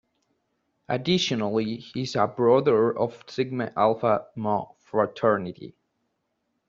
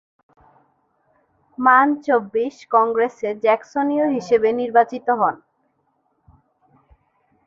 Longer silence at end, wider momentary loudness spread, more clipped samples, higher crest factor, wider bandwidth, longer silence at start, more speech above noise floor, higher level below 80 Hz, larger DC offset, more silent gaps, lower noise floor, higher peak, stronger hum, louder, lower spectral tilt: second, 1 s vs 2.1 s; first, 11 LU vs 8 LU; neither; about the same, 18 dB vs 20 dB; about the same, 7.6 kHz vs 7.4 kHz; second, 0.9 s vs 1.6 s; about the same, 52 dB vs 49 dB; about the same, -66 dBFS vs -64 dBFS; neither; neither; first, -76 dBFS vs -67 dBFS; second, -6 dBFS vs -2 dBFS; neither; second, -25 LUFS vs -19 LUFS; about the same, -6 dB/octave vs -6 dB/octave